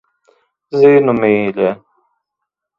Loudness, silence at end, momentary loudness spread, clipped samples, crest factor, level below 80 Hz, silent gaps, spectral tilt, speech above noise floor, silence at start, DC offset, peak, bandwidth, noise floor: -13 LUFS; 1.05 s; 12 LU; under 0.1%; 16 dB; -58 dBFS; none; -9 dB/octave; 67 dB; 0.7 s; under 0.1%; 0 dBFS; 5.6 kHz; -78 dBFS